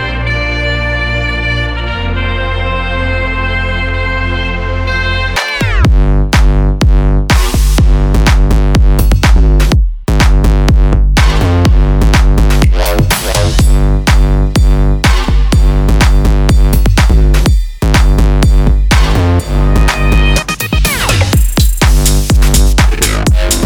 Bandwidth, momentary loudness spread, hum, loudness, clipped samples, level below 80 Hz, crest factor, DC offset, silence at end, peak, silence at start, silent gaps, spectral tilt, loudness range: 17.5 kHz; 5 LU; none; -11 LUFS; under 0.1%; -10 dBFS; 8 dB; under 0.1%; 0 s; 0 dBFS; 0 s; none; -5 dB/octave; 4 LU